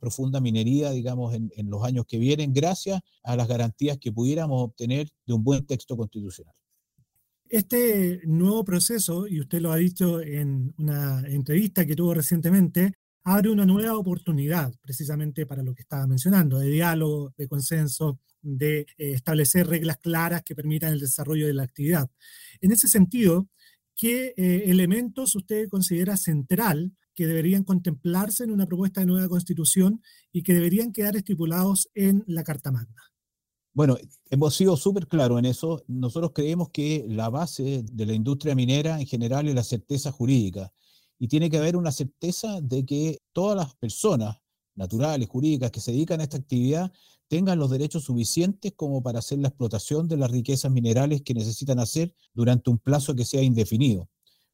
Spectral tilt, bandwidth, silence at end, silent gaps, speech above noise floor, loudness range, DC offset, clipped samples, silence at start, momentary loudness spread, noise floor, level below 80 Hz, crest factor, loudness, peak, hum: -6 dB/octave; 16.5 kHz; 0.45 s; 12.95-13.21 s; 64 dB; 4 LU; under 0.1%; under 0.1%; 0 s; 9 LU; -88 dBFS; -60 dBFS; 20 dB; -25 LUFS; -4 dBFS; none